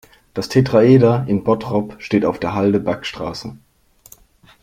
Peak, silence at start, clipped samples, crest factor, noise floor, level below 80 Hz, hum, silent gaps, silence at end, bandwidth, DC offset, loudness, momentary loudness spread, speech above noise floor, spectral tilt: -2 dBFS; 0.35 s; under 0.1%; 16 dB; -48 dBFS; -50 dBFS; none; none; 1.05 s; 15.5 kHz; under 0.1%; -17 LUFS; 16 LU; 32 dB; -7.5 dB/octave